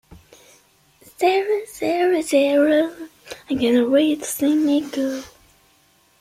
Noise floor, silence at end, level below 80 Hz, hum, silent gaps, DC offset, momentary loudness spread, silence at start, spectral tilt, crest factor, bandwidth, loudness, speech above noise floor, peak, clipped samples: -58 dBFS; 0.9 s; -60 dBFS; none; none; under 0.1%; 11 LU; 0.1 s; -3.5 dB/octave; 16 dB; 16 kHz; -19 LUFS; 40 dB; -6 dBFS; under 0.1%